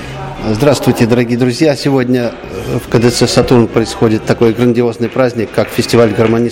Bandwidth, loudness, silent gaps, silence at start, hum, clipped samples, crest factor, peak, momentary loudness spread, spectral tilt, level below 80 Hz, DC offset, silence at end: 17 kHz; -12 LUFS; none; 0 s; none; under 0.1%; 12 dB; 0 dBFS; 8 LU; -6 dB/octave; -36 dBFS; under 0.1%; 0 s